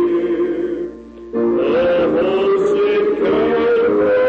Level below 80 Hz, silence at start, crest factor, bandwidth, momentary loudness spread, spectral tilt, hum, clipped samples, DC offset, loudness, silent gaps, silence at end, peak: -48 dBFS; 0 s; 8 dB; 7.8 kHz; 9 LU; -7 dB/octave; none; under 0.1%; under 0.1%; -16 LUFS; none; 0 s; -8 dBFS